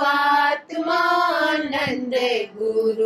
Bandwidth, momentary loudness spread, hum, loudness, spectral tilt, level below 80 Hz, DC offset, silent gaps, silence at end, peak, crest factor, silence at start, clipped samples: 14 kHz; 6 LU; none; -20 LUFS; -4 dB/octave; -66 dBFS; under 0.1%; none; 0 s; -8 dBFS; 12 dB; 0 s; under 0.1%